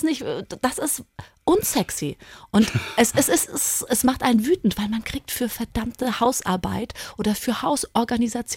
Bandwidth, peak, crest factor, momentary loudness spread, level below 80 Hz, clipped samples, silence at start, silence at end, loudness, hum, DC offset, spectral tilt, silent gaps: 17 kHz; -6 dBFS; 18 dB; 9 LU; -46 dBFS; under 0.1%; 0 s; 0 s; -23 LUFS; none; under 0.1%; -4 dB/octave; none